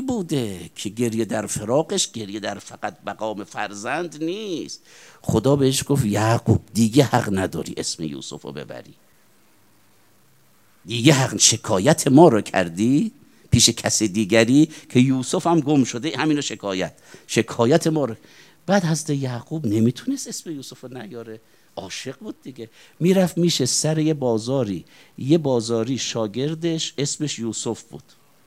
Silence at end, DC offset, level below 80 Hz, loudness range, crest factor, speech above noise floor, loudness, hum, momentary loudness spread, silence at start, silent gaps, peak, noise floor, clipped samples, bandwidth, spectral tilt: 0.45 s; 0.1%; -56 dBFS; 10 LU; 22 dB; 37 dB; -21 LUFS; none; 18 LU; 0 s; none; 0 dBFS; -58 dBFS; under 0.1%; 16 kHz; -4.5 dB/octave